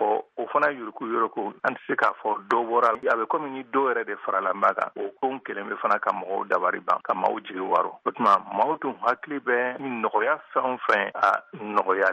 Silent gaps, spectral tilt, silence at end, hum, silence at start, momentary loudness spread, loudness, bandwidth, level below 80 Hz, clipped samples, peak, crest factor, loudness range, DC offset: none; -5.5 dB/octave; 0 s; none; 0 s; 7 LU; -25 LUFS; 9.8 kHz; -78 dBFS; under 0.1%; -8 dBFS; 16 dB; 2 LU; under 0.1%